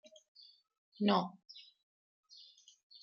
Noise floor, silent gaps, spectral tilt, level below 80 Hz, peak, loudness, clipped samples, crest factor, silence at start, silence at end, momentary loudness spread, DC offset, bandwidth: -61 dBFS; none; -4.5 dB/octave; -88 dBFS; -18 dBFS; -35 LUFS; under 0.1%; 24 dB; 1 s; 1.4 s; 27 LU; under 0.1%; 7 kHz